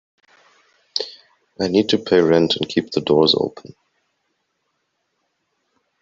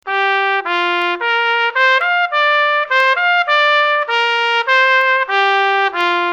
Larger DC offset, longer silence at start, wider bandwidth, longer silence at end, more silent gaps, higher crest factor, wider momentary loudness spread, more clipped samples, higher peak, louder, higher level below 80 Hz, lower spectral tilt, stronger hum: neither; first, 0.95 s vs 0.05 s; second, 7.6 kHz vs 9.2 kHz; first, 2.5 s vs 0 s; neither; about the same, 18 dB vs 14 dB; first, 11 LU vs 4 LU; neither; about the same, -2 dBFS vs -2 dBFS; second, -18 LUFS vs -13 LUFS; first, -60 dBFS vs -70 dBFS; first, -5.5 dB/octave vs -0.5 dB/octave; neither